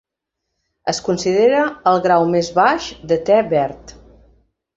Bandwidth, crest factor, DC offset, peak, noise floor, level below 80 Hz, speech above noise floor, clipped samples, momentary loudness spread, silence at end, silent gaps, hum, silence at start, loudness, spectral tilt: 8 kHz; 16 dB; under 0.1%; -2 dBFS; -79 dBFS; -50 dBFS; 63 dB; under 0.1%; 9 LU; 0.85 s; none; none; 0.85 s; -17 LUFS; -5 dB/octave